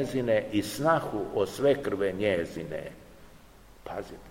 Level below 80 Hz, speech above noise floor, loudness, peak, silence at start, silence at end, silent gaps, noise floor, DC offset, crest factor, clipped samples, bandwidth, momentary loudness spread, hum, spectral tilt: -56 dBFS; 24 dB; -29 LUFS; -10 dBFS; 0 s; 0 s; none; -53 dBFS; 0.1%; 18 dB; under 0.1%; 16.5 kHz; 13 LU; none; -5.5 dB/octave